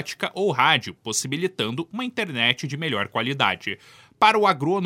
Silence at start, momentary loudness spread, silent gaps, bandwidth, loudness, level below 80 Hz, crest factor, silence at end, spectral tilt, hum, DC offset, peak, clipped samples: 0 s; 10 LU; none; 16 kHz; -22 LUFS; -70 dBFS; 22 dB; 0 s; -3.5 dB/octave; none; under 0.1%; -2 dBFS; under 0.1%